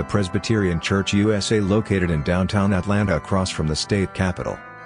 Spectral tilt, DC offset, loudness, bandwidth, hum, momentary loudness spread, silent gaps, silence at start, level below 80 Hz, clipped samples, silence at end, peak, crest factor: -5.5 dB/octave; under 0.1%; -21 LUFS; 10.5 kHz; none; 4 LU; none; 0 s; -42 dBFS; under 0.1%; 0 s; -6 dBFS; 16 dB